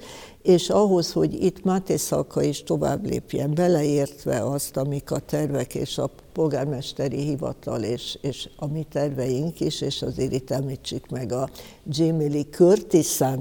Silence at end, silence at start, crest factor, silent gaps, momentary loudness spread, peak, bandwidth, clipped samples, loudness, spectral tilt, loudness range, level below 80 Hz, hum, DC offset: 0 s; 0 s; 18 dB; none; 11 LU; -6 dBFS; 17.5 kHz; under 0.1%; -24 LUFS; -6 dB/octave; 5 LU; -50 dBFS; none; under 0.1%